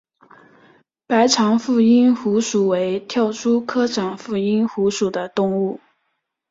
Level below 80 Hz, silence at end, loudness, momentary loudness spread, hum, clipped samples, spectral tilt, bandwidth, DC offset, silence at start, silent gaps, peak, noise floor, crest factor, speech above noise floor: -62 dBFS; 0.75 s; -18 LUFS; 8 LU; none; under 0.1%; -5 dB/octave; 7.8 kHz; under 0.1%; 1.1 s; none; -2 dBFS; -73 dBFS; 16 dB; 55 dB